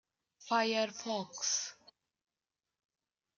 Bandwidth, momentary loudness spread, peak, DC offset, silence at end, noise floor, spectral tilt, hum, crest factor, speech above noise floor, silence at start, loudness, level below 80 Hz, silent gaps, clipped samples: 10.5 kHz; 8 LU; -18 dBFS; under 0.1%; 1.65 s; under -90 dBFS; -1.5 dB/octave; none; 20 dB; over 55 dB; 0.4 s; -35 LUFS; under -90 dBFS; none; under 0.1%